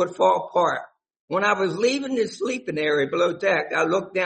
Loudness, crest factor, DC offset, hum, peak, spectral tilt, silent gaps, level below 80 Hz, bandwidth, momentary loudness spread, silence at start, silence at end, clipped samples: -23 LUFS; 16 dB; under 0.1%; none; -6 dBFS; -4.5 dB/octave; 1.20-1.28 s; -68 dBFS; 8.8 kHz; 6 LU; 0 s; 0 s; under 0.1%